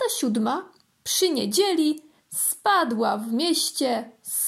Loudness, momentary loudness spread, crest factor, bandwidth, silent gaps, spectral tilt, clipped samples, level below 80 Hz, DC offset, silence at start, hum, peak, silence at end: -23 LUFS; 9 LU; 16 dB; 16 kHz; none; -2.5 dB/octave; under 0.1%; -76 dBFS; under 0.1%; 0 s; none; -8 dBFS; 0 s